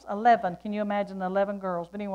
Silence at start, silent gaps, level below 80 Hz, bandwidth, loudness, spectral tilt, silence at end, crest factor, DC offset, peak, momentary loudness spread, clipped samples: 0.05 s; none; -64 dBFS; 7.2 kHz; -27 LUFS; -7.5 dB/octave; 0 s; 16 dB; under 0.1%; -10 dBFS; 10 LU; under 0.1%